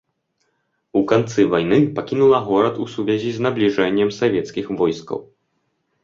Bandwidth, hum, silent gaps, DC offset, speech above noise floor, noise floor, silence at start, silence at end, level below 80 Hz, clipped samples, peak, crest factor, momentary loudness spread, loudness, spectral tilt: 7.4 kHz; none; none; under 0.1%; 52 dB; -70 dBFS; 0.95 s; 0.8 s; -56 dBFS; under 0.1%; -2 dBFS; 18 dB; 8 LU; -19 LUFS; -6.5 dB/octave